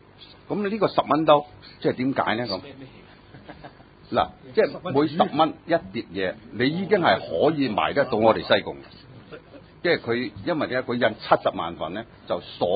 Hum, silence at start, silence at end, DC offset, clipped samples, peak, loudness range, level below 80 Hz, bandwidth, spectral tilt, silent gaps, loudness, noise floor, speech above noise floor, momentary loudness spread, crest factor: none; 0.2 s; 0 s; under 0.1%; under 0.1%; -2 dBFS; 4 LU; -56 dBFS; 5 kHz; -10 dB/octave; none; -24 LUFS; -46 dBFS; 23 dB; 17 LU; 22 dB